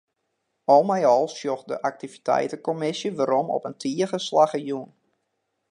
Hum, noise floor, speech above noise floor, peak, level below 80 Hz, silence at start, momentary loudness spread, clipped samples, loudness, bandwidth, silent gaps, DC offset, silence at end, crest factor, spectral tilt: none; -77 dBFS; 54 dB; -4 dBFS; -78 dBFS; 0.7 s; 11 LU; under 0.1%; -24 LUFS; 10.5 kHz; none; under 0.1%; 0.85 s; 20 dB; -5 dB/octave